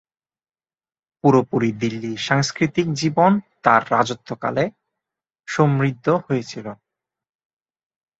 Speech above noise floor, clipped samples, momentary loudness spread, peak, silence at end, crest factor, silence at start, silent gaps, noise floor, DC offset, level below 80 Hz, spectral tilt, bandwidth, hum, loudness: over 71 dB; under 0.1%; 10 LU; 0 dBFS; 1.45 s; 22 dB; 1.25 s; none; under -90 dBFS; under 0.1%; -60 dBFS; -6 dB/octave; 8 kHz; none; -20 LUFS